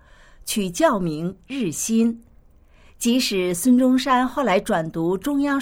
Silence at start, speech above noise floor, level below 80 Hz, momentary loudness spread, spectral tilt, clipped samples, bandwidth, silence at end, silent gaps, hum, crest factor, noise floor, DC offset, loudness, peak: 0.45 s; 31 dB; -50 dBFS; 10 LU; -4.5 dB/octave; under 0.1%; 17 kHz; 0 s; none; none; 16 dB; -51 dBFS; under 0.1%; -21 LUFS; -6 dBFS